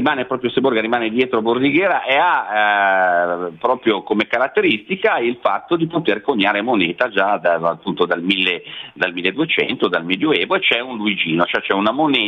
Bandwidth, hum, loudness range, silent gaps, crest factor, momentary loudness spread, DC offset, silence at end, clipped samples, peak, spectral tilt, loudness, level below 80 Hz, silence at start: 6.4 kHz; none; 2 LU; none; 16 dB; 5 LU; under 0.1%; 0 s; under 0.1%; -2 dBFS; -6.5 dB/octave; -17 LUFS; -62 dBFS; 0 s